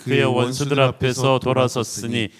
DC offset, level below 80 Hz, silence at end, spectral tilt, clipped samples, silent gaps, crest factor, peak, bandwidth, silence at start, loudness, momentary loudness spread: under 0.1%; -50 dBFS; 0.1 s; -5 dB/octave; under 0.1%; none; 18 dB; -2 dBFS; 15.5 kHz; 0 s; -19 LUFS; 6 LU